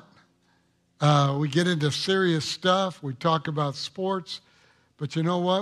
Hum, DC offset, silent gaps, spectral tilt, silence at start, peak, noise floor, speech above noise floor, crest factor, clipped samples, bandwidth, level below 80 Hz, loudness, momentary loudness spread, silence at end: none; under 0.1%; none; -5.5 dB/octave; 1 s; -6 dBFS; -67 dBFS; 42 dB; 20 dB; under 0.1%; 12 kHz; -68 dBFS; -25 LUFS; 9 LU; 0 s